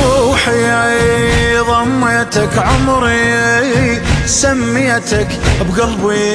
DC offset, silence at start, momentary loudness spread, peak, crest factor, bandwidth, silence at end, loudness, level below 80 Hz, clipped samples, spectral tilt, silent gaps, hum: under 0.1%; 0 s; 3 LU; 0 dBFS; 12 dB; 13.5 kHz; 0 s; -12 LUFS; -24 dBFS; under 0.1%; -4.5 dB/octave; none; none